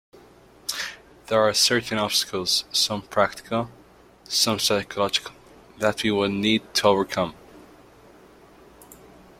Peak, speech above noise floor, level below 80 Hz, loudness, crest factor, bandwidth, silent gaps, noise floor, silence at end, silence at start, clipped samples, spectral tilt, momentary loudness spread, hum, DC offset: -4 dBFS; 28 dB; -58 dBFS; -23 LUFS; 22 dB; 16.5 kHz; none; -51 dBFS; 0.45 s; 0.7 s; under 0.1%; -2.5 dB/octave; 11 LU; none; under 0.1%